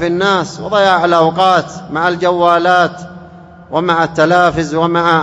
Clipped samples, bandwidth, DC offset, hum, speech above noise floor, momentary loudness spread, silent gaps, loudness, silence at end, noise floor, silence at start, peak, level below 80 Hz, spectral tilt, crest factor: 0.3%; 11 kHz; under 0.1%; none; 24 dB; 7 LU; none; -12 LUFS; 0 s; -36 dBFS; 0 s; 0 dBFS; -46 dBFS; -5.5 dB/octave; 12 dB